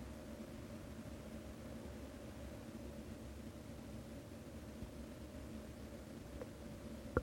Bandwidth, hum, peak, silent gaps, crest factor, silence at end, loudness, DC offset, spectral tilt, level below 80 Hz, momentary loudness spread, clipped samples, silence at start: 16.5 kHz; none; -20 dBFS; none; 30 dB; 0 s; -52 LUFS; under 0.1%; -6 dB/octave; -58 dBFS; 1 LU; under 0.1%; 0 s